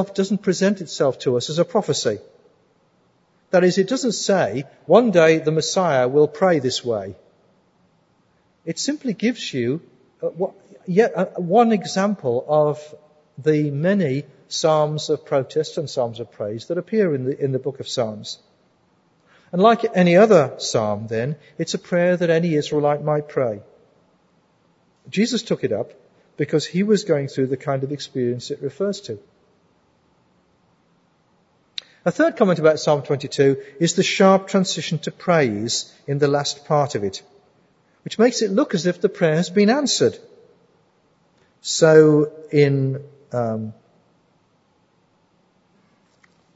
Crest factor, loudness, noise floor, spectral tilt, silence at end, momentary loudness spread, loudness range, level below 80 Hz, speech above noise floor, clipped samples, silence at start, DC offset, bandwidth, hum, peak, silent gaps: 20 dB; -20 LUFS; -62 dBFS; -5 dB/octave; 2.85 s; 13 LU; 8 LU; -68 dBFS; 43 dB; under 0.1%; 0 s; under 0.1%; 8 kHz; none; 0 dBFS; none